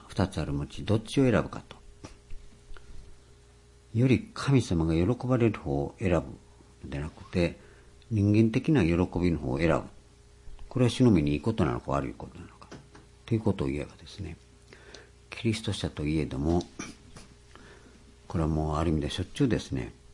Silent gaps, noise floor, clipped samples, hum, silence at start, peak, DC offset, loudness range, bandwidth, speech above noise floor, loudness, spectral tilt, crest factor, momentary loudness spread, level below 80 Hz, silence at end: none; -56 dBFS; under 0.1%; none; 0.05 s; -8 dBFS; under 0.1%; 6 LU; 11.5 kHz; 29 dB; -28 LUFS; -7 dB/octave; 20 dB; 22 LU; -46 dBFS; 0 s